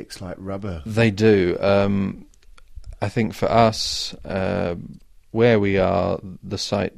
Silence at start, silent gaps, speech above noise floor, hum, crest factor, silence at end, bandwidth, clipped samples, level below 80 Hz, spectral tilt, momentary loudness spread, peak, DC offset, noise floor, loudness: 0 s; none; 21 dB; none; 18 dB; 0.1 s; 15 kHz; under 0.1%; -44 dBFS; -6 dB/octave; 14 LU; -4 dBFS; under 0.1%; -42 dBFS; -21 LUFS